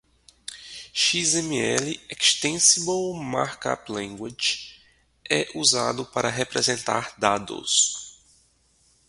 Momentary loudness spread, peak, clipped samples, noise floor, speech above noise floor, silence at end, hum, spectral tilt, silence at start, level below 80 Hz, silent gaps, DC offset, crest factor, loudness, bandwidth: 16 LU; -2 dBFS; under 0.1%; -63 dBFS; 38 dB; 0.95 s; none; -1.5 dB/octave; 0.5 s; -62 dBFS; none; under 0.1%; 24 dB; -23 LUFS; 11.5 kHz